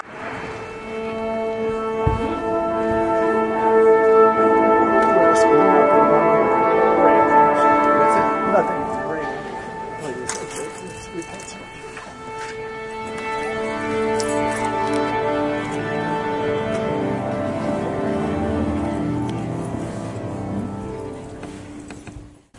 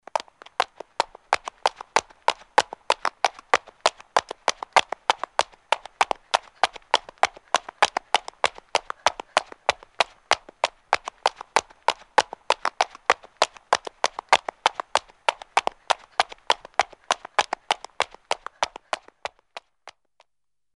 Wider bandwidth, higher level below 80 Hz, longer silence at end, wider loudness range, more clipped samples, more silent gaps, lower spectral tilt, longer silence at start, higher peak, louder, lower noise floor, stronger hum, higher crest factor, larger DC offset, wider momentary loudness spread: about the same, 11.5 kHz vs 11.5 kHz; first, -44 dBFS vs -62 dBFS; second, 0 s vs 0.85 s; first, 14 LU vs 2 LU; neither; neither; first, -6 dB/octave vs 0 dB/octave; about the same, 0.05 s vs 0.15 s; about the same, -2 dBFS vs -2 dBFS; first, -19 LUFS vs -25 LUFS; second, -40 dBFS vs -86 dBFS; neither; second, 18 dB vs 26 dB; neither; first, 18 LU vs 7 LU